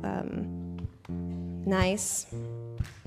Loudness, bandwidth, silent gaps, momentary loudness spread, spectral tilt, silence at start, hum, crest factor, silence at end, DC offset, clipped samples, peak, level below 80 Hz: -32 LUFS; 15.5 kHz; none; 12 LU; -4.5 dB/octave; 0 s; none; 18 dB; 0 s; under 0.1%; under 0.1%; -14 dBFS; -46 dBFS